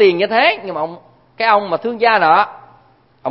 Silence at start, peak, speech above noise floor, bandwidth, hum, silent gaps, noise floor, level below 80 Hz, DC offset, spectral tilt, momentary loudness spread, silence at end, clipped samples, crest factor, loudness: 0 s; 0 dBFS; 37 dB; 5.8 kHz; none; none; -51 dBFS; -66 dBFS; 0.1%; -7 dB/octave; 12 LU; 0 s; under 0.1%; 16 dB; -15 LUFS